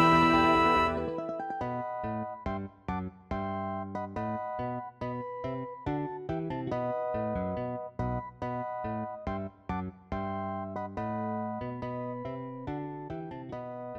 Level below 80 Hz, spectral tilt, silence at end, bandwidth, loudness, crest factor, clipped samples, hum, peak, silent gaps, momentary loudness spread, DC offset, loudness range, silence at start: -52 dBFS; -7 dB/octave; 0 s; 12.5 kHz; -33 LUFS; 22 dB; under 0.1%; none; -10 dBFS; none; 12 LU; under 0.1%; 5 LU; 0 s